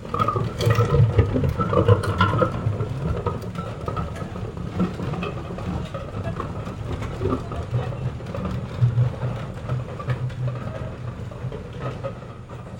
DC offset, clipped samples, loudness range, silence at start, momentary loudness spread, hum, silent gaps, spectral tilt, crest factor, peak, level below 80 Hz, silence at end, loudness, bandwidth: under 0.1%; under 0.1%; 8 LU; 0 s; 13 LU; none; none; -7.5 dB/octave; 22 dB; -2 dBFS; -36 dBFS; 0 s; -25 LUFS; 17 kHz